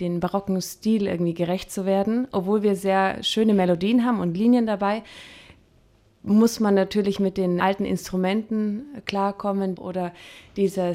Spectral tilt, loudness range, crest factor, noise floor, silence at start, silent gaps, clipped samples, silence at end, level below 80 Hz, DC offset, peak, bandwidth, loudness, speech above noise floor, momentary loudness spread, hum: -6 dB/octave; 4 LU; 16 dB; -58 dBFS; 0 s; none; under 0.1%; 0 s; -56 dBFS; under 0.1%; -6 dBFS; 16 kHz; -23 LUFS; 35 dB; 10 LU; none